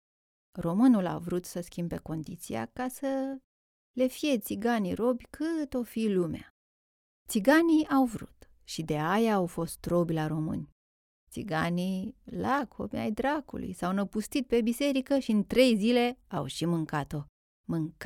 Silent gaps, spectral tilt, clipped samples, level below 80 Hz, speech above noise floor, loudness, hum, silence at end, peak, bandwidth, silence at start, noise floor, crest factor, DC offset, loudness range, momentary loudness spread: 3.44-3.94 s, 6.50-7.26 s, 10.72-11.27 s, 17.29-17.64 s; -6 dB/octave; under 0.1%; -58 dBFS; over 61 dB; -30 LUFS; none; 0 s; -10 dBFS; 17 kHz; 0.55 s; under -90 dBFS; 20 dB; under 0.1%; 5 LU; 14 LU